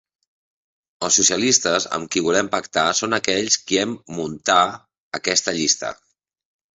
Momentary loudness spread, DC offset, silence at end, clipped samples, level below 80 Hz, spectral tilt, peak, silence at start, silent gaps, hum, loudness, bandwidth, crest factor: 11 LU; under 0.1%; 0.8 s; under 0.1%; -60 dBFS; -1.5 dB/octave; -2 dBFS; 1 s; 5.00-5.11 s; none; -19 LUFS; 8.4 kHz; 20 dB